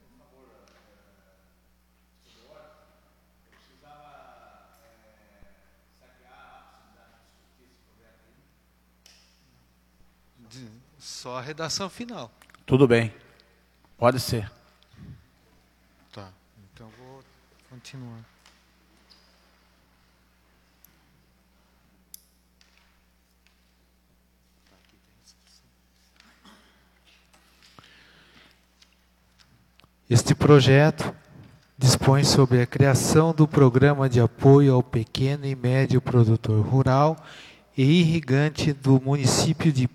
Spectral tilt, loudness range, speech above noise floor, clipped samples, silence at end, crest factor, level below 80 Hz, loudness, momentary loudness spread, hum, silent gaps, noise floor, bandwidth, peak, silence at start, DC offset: -6 dB/octave; 17 LU; 44 dB; under 0.1%; 0.05 s; 24 dB; -54 dBFS; -21 LUFS; 23 LU; none; none; -64 dBFS; 14 kHz; -2 dBFS; 10.55 s; under 0.1%